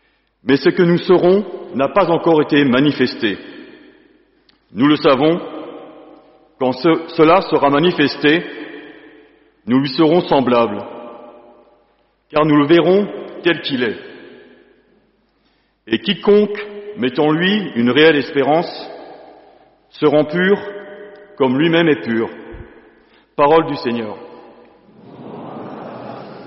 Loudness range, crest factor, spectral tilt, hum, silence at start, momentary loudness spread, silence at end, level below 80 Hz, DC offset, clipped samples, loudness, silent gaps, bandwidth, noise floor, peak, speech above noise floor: 5 LU; 16 dB; -4 dB/octave; none; 0.45 s; 20 LU; 0 s; -54 dBFS; under 0.1%; under 0.1%; -15 LUFS; none; 5.8 kHz; -60 dBFS; 0 dBFS; 46 dB